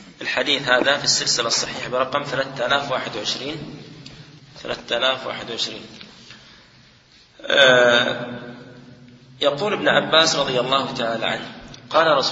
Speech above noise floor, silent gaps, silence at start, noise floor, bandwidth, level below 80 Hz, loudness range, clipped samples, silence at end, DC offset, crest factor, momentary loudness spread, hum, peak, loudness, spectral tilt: 32 dB; none; 0 s; -52 dBFS; 8 kHz; -58 dBFS; 8 LU; under 0.1%; 0 s; under 0.1%; 22 dB; 21 LU; none; 0 dBFS; -19 LUFS; -2 dB/octave